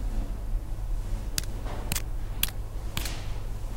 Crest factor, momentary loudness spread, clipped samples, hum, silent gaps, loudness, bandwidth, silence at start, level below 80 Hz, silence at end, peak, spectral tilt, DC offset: 26 dB; 7 LU; under 0.1%; none; none; -34 LUFS; 17 kHz; 0 s; -32 dBFS; 0 s; -4 dBFS; -3.5 dB/octave; under 0.1%